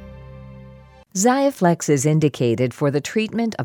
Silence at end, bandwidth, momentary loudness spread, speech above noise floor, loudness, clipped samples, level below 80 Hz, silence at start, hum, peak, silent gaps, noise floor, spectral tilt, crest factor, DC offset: 0 s; 17.5 kHz; 23 LU; 26 dB; -19 LUFS; under 0.1%; -52 dBFS; 0 s; none; -4 dBFS; none; -45 dBFS; -5.5 dB/octave; 16 dB; under 0.1%